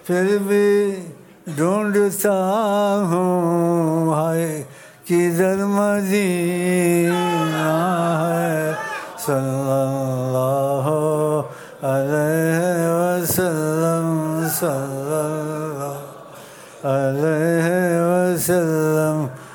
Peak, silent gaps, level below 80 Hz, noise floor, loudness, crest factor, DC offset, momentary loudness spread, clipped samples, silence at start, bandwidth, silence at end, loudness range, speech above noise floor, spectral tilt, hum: -4 dBFS; none; -62 dBFS; -40 dBFS; -19 LUFS; 14 dB; under 0.1%; 9 LU; under 0.1%; 0.05 s; 19.5 kHz; 0 s; 3 LU; 21 dB; -6 dB/octave; none